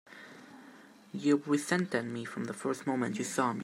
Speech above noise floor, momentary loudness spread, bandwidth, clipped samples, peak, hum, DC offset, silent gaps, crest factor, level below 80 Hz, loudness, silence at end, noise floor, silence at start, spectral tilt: 23 dB; 21 LU; 15.5 kHz; under 0.1%; -14 dBFS; none; under 0.1%; none; 20 dB; -80 dBFS; -32 LUFS; 0 s; -55 dBFS; 0.1 s; -5 dB/octave